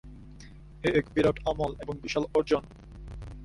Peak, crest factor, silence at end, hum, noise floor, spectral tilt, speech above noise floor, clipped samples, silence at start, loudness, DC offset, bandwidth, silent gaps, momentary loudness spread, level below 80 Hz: -12 dBFS; 20 dB; 0 s; none; -48 dBFS; -6 dB/octave; 20 dB; under 0.1%; 0.05 s; -29 LUFS; under 0.1%; 11.5 kHz; none; 23 LU; -46 dBFS